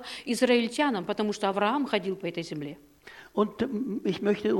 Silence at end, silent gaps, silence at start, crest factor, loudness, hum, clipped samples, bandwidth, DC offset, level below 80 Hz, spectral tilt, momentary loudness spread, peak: 0 s; none; 0 s; 18 dB; -28 LUFS; none; under 0.1%; 17 kHz; under 0.1%; -66 dBFS; -5 dB/octave; 13 LU; -10 dBFS